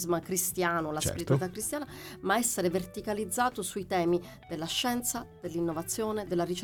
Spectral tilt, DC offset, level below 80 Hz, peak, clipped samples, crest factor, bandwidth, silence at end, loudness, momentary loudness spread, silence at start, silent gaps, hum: -4 dB/octave; under 0.1%; -56 dBFS; -14 dBFS; under 0.1%; 18 dB; 19 kHz; 0 s; -31 LUFS; 9 LU; 0 s; none; none